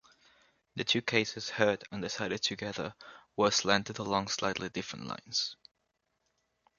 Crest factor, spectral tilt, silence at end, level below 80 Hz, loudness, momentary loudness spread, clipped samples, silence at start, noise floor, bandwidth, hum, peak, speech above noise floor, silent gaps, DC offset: 26 dB; -3 dB/octave; 1.25 s; -66 dBFS; -32 LUFS; 12 LU; under 0.1%; 0.75 s; -80 dBFS; 7.4 kHz; none; -10 dBFS; 48 dB; none; under 0.1%